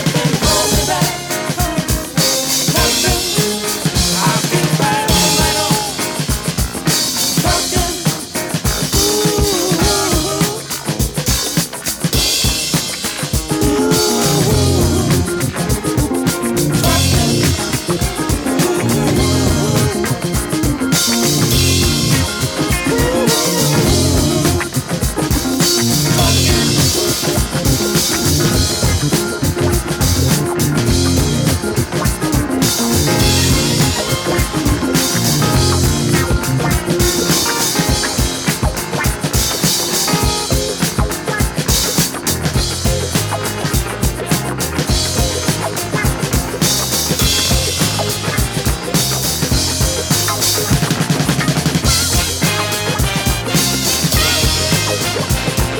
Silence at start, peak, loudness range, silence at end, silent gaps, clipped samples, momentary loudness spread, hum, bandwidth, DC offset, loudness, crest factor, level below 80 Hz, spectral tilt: 0 s; 0 dBFS; 2 LU; 0 s; none; under 0.1%; 5 LU; none; over 20 kHz; under 0.1%; -14 LUFS; 14 dB; -26 dBFS; -3.5 dB/octave